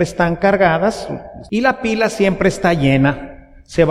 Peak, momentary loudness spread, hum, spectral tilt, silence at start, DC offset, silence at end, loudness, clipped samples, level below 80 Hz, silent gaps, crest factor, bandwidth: 0 dBFS; 14 LU; none; -6 dB/octave; 0 s; under 0.1%; 0 s; -16 LUFS; under 0.1%; -38 dBFS; none; 16 dB; 14 kHz